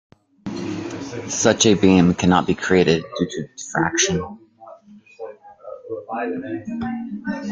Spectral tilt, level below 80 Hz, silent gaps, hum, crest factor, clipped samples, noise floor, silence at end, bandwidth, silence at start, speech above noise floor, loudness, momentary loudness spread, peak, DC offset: -4.5 dB/octave; -54 dBFS; none; none; 20 dB; under 0.1%; -45 dBFS; 0 s; 9.4 kHz; 0.45 s; 26 dB; -20 LUFS; 21 LU; -2 dBFS; under 0.1%